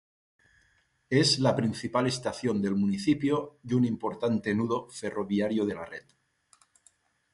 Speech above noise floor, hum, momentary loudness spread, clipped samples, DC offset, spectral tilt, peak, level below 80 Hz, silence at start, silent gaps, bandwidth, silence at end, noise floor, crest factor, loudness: 41 dB; none; 8 LU; under 0.1%; under 0.1%; -5.5 dB/octave; -10 dBFS; -62 dBFS; 1.1 s; none; 11.5 kHz; 1.35 s; -69 dBFS; 20 dB; -28 LUFS